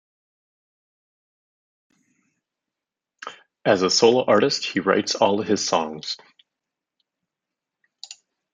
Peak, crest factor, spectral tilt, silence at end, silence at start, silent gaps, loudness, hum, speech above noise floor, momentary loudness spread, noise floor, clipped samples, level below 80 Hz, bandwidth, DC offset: -2 dBFS; 22 dB; -3.5 dB/octave; 0.4 s; 3.25 s; none; -20 LUFS; none; 67 dB; 23 LU; -87 dBFS; under 0.1%; -74 dBFS; 9.6 kHz; under 0.1%